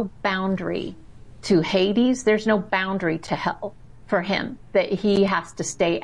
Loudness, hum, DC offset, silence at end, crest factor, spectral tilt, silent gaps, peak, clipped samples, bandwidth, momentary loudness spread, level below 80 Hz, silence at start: -23 LUFS; none; 0.4%; 0 s; 16 dB; -5 dB/octave; none; -8 dBFS; under 0.1%; 11.5 kHz; 10 LU; -52 dBFS; 0 s